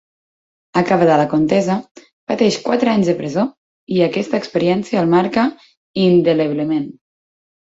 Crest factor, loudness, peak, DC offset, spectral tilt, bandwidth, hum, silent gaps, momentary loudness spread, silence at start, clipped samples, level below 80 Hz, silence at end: 16 dB; -17 LUFS; -2 dBFS; under 0.1%; -6.5 dB/octave; 8 kHz; none; 1.91-1.95 s, 2.13-2.27 s, 3.57-3.87 s, 5.77-5.94 s; 9 LU; 0.75 s; under 0.1%; -58 dBFS; 0.85 s